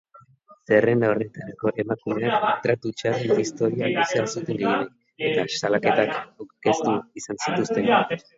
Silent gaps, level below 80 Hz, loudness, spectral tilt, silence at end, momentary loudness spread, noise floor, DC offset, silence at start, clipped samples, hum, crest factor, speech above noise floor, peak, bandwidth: none; -64 dBFS; -23 LUFS; -5 dB/octave; 0.2 s; 8 LU; -53 dBFS; under 0.1%; 0.5 s; under 0.1%; none; 20 dB; 30 dB; -4 dBFS; 8 kHz